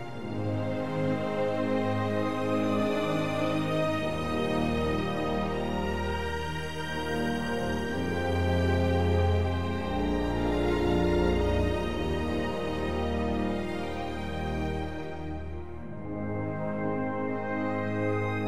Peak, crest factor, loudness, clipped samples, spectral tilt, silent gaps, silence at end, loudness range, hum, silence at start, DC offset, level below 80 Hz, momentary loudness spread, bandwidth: -14 dBFS; 16 dB; -30 LUFS; under 0.1%; -7 dB/octave; none; 0 s; 6 LU; none; 0 s; 0.9%; -40 dBFS; 8 LU; 15 kHz